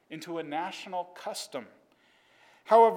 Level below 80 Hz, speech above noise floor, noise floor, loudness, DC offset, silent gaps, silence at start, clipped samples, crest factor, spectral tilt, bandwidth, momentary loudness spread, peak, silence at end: under -90 dBFS; 37 dB; -65 dBFS; -31 LUFS; under 0.1%; none; 0.1 s; under 0.1%; 20 dB; -4 dB/octave; 16.5 kHz; 17 LU; -10 dBFS; 0 s